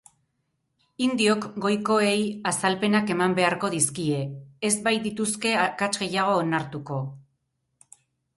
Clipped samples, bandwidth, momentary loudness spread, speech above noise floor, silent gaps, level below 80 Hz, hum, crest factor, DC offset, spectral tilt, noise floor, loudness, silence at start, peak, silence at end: under 0.1%; 12 kHz; 8 LU; 51 dB; none; -66 dBFS; none; 20 dB; under 0.1%; -4 dB/octave; -76 dBFS; -24 LUFS; 1 s; -6 dBFS; 1.15 s